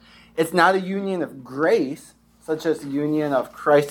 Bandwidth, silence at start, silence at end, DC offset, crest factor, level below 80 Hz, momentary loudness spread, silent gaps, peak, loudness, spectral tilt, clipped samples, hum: 18.5 kHz; 0.35 s; 0 s; under 0.1%; 20 dB; -64 dBFS; 12 LU; none; -2 dBFS; -22 LUFS; -5.5 dB/octave; under 0.1%; none